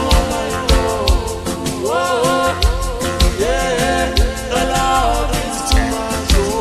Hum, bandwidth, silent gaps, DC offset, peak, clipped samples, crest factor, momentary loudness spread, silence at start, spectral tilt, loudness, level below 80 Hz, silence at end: none; 13.5 kHz; none; under 0.1%; -2 dBFS; under 0.1%; 14 dB; 4 LU; 0 s; -4 dB/octave; -17 LUFS; -20 dBFS; 0 s